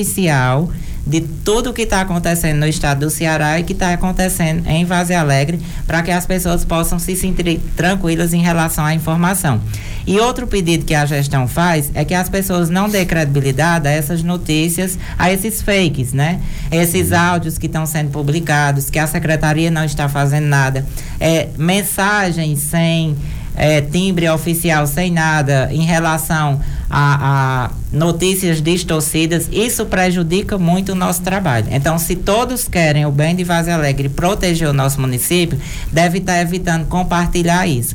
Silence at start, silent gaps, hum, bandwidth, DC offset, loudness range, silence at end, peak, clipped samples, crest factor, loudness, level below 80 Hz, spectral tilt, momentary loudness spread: 0 s; none; none; 18.5 kHz; under 0.1%; 1 LU; 0 s; 0 dBFS; under 0.1%; 14 dB; -15 LUFS; -26 dBFS; -5 dB/octave; 4 LU